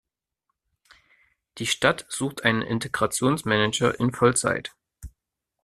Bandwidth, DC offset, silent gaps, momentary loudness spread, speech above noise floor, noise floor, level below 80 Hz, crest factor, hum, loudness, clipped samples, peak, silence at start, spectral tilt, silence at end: 14 kHz; under 0.1%; none; 8 LU; 59 dB; -83 dBFS; -54 dBFS; 24 dB; none; -24 LUFS; under 0.1%; -4 dBFS; 1.55 s; -4 dB/octave; 0.55 s